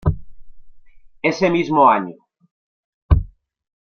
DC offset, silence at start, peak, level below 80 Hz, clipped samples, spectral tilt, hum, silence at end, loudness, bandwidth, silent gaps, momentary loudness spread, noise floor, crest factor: under 0.1%; 0.05 s; -2 dBFS; -30 dBFS; under 0.1%; -7.5 dB/octave; none; 0.55 s; -18 LUFS; 6.8 kHz; 2.51-3.09 s; 19 LU; -42 dBFS; 18 dB